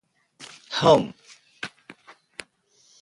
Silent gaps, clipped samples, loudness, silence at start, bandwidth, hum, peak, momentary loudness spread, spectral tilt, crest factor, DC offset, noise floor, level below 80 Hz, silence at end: none; under 0.1%; -21 LUFS; 0.4 s; 11.5 kHz; none; -4 dBFS; 25 LU; -5 dB/octave; 22 dB; under 0.1%; -62 dBFS; -60 dBFS; 1.35 s